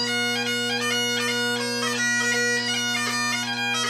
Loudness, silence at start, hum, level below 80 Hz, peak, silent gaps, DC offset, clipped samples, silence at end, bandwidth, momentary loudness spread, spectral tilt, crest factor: -22 LUFS; 0 s; none; -68 dBFS; -12 dBFS; none; under 0.1%; under 0.1%; 0 s; 15.5 kHz; 3 LU; -1.5 dB/octave; 12 dB